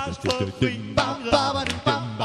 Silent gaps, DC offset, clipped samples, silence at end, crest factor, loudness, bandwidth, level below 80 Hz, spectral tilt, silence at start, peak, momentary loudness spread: none; under 0.1%; under 0.1%; 0 s; 20 dB; -24 LUFS; 12.5 kHz; -46 dBFS; -5 dB/octave; 0 s; -4 dBFS; 4 LU